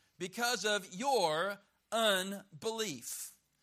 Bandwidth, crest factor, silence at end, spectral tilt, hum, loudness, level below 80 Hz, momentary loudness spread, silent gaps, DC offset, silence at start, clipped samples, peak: 15.5 kHz; 18 dB; 0.3 s; -2 dB/octave; none; -35 LUFS; -82 dBFS; 12 LU; none; under 0.1%; 0.2 s; under 0.1%; -16 dBFS